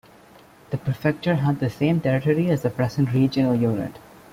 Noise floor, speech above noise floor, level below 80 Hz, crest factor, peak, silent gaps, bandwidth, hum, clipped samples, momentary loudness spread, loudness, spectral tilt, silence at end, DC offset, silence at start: -50 dBFS; 28 dB; -54 dBFS; 14 dB; -8 dBFS; none; 15.5 kHz; none; under 0.1%; 8 LU; -22 LUFS; -8 dB/octave; 0.35 s; under 0.1%; 0.7 s